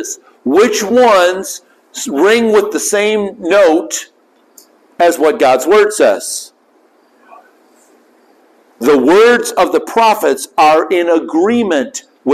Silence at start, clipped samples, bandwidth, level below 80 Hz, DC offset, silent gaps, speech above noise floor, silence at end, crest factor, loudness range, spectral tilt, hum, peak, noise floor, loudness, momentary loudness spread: 0 s; under 0.1%; 15 kHz; -56 dBFS; under 0.1%; none; 40 dB; 0 s; 10 dB; 4 LU; -3 dB/octave; none; -2 dBFS; -51 dBFS; -11 LUFS; 13 LU